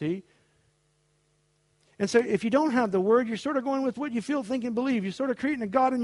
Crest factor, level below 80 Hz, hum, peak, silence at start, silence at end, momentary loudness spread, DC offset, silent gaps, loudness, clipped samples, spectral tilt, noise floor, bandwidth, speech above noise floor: 18 dB; -68 dBFS; none; -8 dBFS; 0 s; 0 s; 6 LU; under 0.1%; none; -27 LUFS; under 0.1%; -6 dB/octave; -69 dBFS; 11.5 kHz; 43 dB